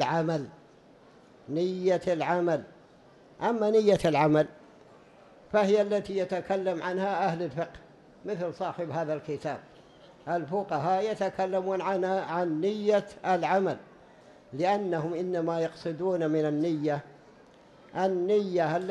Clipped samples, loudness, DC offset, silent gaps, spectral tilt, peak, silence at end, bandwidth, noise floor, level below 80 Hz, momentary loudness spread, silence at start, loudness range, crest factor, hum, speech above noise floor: under 0.1%; -29 LUFS; under 0.1%; none; -6.5 dB/octave; -12 dBFS; 0 s; 11.5 kHz; -56 dBFS; -66 dBFS; 10 LU; 0 s; 5 LU; 18 dB; none; 28 dB